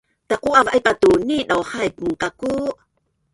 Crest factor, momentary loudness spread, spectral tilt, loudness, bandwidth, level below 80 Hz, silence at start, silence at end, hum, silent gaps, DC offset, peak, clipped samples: 18 dB; 9 LU; -4.5 dB/octave; -19 LUFS; 11.5 kHz; -50 dBFS; 0.3 s; 0.6 s; none; none; under 0.1%; 0 dBFS; under 0.1%